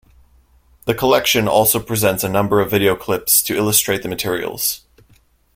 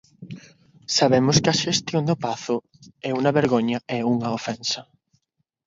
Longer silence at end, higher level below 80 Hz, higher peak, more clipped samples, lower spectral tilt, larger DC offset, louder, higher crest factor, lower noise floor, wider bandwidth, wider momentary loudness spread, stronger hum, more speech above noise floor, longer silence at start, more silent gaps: about the same, 0.8 s vs 0.85 s; first, -46 dBFS vs -58 dBFS; about the same, 0 dBFS vs -2 dBFS; neither; second, -3 dB/octave vs -4.5 dB/octave; neither; first, -16 LUFS vs -22 LUFS; about the same, 18 dB vs 22 dB; second, -54 dBFS vs -74 dBFS; first, 16.5 kHz vs 7.8 kHz; second, 8 LU vs 19 LU; neither; second, 38 dB vs 52 dB; first, 0.85 s vs 0.2 s; neither